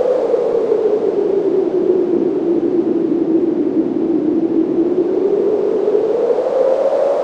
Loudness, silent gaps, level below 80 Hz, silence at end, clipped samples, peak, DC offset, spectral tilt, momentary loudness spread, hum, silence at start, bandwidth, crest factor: -16 LUFS; none; -58 dBFS; 0 s; under 0.1%; -2 dBFS; under 0.1%; -8.5 dB/octave; 1 LU; none; 0 s; 7 kHz; 14 dB